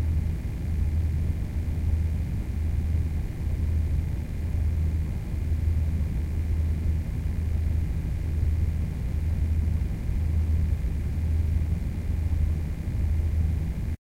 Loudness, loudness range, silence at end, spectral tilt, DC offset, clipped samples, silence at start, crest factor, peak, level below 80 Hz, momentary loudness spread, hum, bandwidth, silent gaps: -28 LUFS; 1 LU; 0.05 s; -8.5 dB/octave; under 0.1%; under 0.1%; 0 s; 12 dB; -14 dBFS; -28 dBFS; 4 LU; none; 7.8 kHz; none